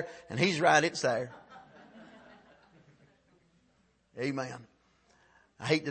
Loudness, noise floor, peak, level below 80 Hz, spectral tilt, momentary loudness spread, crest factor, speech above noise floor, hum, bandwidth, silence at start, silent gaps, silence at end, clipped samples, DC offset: -30 LUFS; -70 dBFS; -10 dBFS; -74 dBFS; -4 dB/octave; 29 LU; 24 dB; 40 dB; none; 8.8 kHz; 0 s; none; 0 s; under 0.1%; under 0.1%